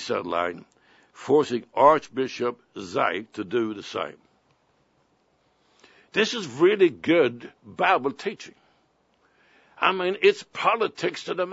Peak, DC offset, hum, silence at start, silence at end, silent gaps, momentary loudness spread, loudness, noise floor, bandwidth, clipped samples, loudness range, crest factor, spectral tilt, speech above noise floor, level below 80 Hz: -4 dBFS; under 0.1%; none; 0 s; 0 s; none; 14 LU; -24 LUFS; -66 dBFS; 8 kHz; under 0.1%; 7 LU; 22 dB; -4.5 dB/octave; 42 dB; -72 dBFS